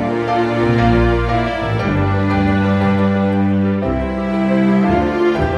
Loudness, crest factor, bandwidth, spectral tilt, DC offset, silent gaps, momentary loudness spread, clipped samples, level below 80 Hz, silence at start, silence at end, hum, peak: -16 LUFS; 12 dB; 8.2 kHz; -8.5 dB/octave; under 0.1%; none; 5 LU; under 0.1%; -28 dBFS; 0 s; 0 s; none; -2 dBFS